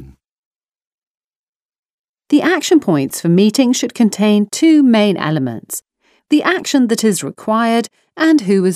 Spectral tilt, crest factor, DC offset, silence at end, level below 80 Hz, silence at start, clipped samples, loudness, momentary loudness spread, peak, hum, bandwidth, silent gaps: -5 dB/octave; 14 dB; under 0.1%; 0 s; -60 dBFS; 0 s; under 0.1%; -14 LUFS; 8 LU; 0 dBFS; none; 15.5 kHz; 0.29-0.51 s, 0.68-0.72 s, 0.87-1.15 s, 1.24-1.69 s, 1.78-1.83 s, 1.90-2.14 s